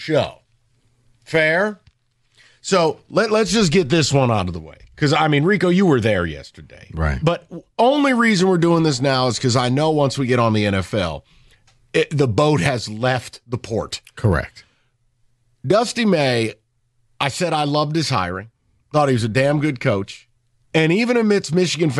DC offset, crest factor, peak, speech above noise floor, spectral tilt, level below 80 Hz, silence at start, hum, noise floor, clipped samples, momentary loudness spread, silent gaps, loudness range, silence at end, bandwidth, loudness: under 0.1%; 16 dB; -4 dBFS; 46 dB; -5.5 dB/octave; -42 dBFS; 0 s; none; -64 dBFS; under 0.1%; 11 LU; none; 5 LU; 0 s; 12.5 kHz; -18 LUFS